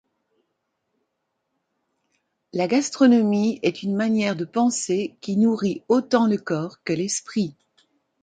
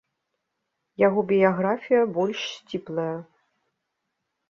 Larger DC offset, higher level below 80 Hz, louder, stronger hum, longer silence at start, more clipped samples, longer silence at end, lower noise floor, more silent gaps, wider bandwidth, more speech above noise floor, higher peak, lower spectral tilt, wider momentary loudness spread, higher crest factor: neither; about the same, -68 dBFS vs -70 dBFS; about the same, -22 LUFS vs -24 LUFS; neither; first, 2.55 s vs 1 s; neither; second, 0.7 s vs 1.25 s; about the same, -77 dBFS vs -80 dBFS; neither; first, 9.4 kHz vs 7 kHz; about the same, 56 dB vs 57 dB; about the same, -6 dBFS vs -6 dBFS; second, -5 dB/octave vs -6.5 dB/octave; second, 9 LU vs 13 LU; about the same, 18 dB vs 20 dB